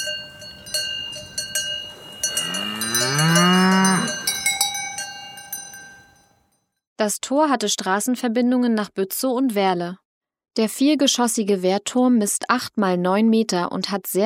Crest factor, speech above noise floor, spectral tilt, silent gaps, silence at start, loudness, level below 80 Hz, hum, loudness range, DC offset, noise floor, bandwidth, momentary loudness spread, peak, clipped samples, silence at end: 20 dB; 47 dB; -3.5 dB/octave; 6.87-6.96 s, 10.05-10.21 s; 0 s; -20 LUFS; -62 dBFS; none; 6 LU; under 0.1%; -67 dBFS; 19 kHz; 13 LU; -2 dBFS; under 0.1%; 0 s